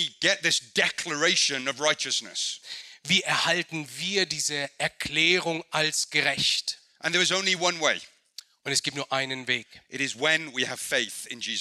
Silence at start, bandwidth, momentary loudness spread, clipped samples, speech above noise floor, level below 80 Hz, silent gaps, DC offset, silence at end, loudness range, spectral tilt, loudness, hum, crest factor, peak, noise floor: 0 s; 15 kHz; 10 LU; under 0.1%; 23 dB; -68 dBFS; none; under 0.1%; 0 s; 3 LU; -1.5 dB/octave; -25 LUFS; none; 20 dB; -6 dBFS; -50 dBFS